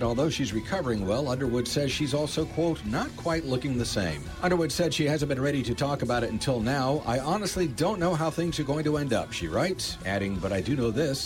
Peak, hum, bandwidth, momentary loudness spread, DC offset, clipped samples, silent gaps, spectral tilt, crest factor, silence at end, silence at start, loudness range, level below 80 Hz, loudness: -14 dBFS; none; 17 kHz; 3 LU; under 0.1%; under 0.1%; none; -5 dB/octave; 14 dB; 0 s; 0 s; 1 LU; -46 dBFS; -28 LUFS